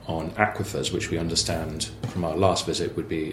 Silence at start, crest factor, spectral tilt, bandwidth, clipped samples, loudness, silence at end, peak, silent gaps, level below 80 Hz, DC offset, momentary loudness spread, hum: 0 s; 24 dB; -4 dB/octave; 16 kHz; under 0.1%; -26 LUFS; 0 s; -2 dBFS; none; -44 dBFS; under 0.1%; 7 LU; none